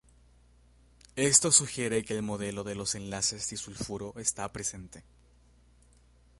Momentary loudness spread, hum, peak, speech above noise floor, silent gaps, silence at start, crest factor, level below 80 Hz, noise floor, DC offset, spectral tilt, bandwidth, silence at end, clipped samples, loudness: 15 LU; 60 Hz at -60 dBFS; -8 dBFS; 30 dB; none; 1.15 s; 26 dB; -58 dBFS; -61 dBFS; under 0.1%; -2.5 dB/octave; 12 kHz; 1.4 s; under 0.1%; -28 LUFS